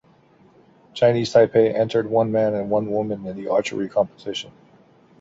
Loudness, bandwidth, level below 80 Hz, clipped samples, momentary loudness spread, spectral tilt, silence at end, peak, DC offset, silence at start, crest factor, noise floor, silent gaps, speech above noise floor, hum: -21 LUFS; 8 kHz; -60 dBFS; under 0.1%; 14 LU; -6 dB/octave; 0.7 s; -4 dBFS; under 0.1%; 0.95 s; 18 dB; -54 dBFS; none; 34 dB; none